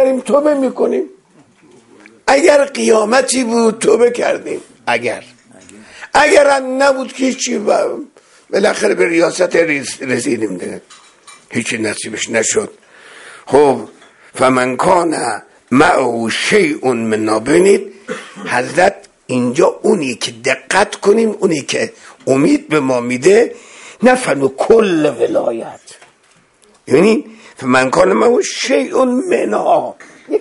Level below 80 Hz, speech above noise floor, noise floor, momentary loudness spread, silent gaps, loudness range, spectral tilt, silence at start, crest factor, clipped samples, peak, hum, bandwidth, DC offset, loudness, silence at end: -52 dBFS; 39 dB; -52 dBFS; 12 LU; none; 3 LU; -4 dB/octave; 0 s; 14 dB; under 0.1%; 0 dBFS; none; 11.5 kHz; under 0.1%; -13 LUFS; 0 s